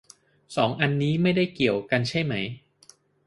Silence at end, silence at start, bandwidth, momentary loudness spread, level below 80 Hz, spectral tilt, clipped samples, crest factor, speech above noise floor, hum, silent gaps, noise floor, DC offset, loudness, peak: 0.7 s; 0.5 s; 11.5 kHz; 10 LU; -60 dBFS; -6.5 dB/octave; under 0.1%; 22 dB; 33 dB; none; none; -57 dBFS; under 0.1%; -25 LUFS; -4 dBFS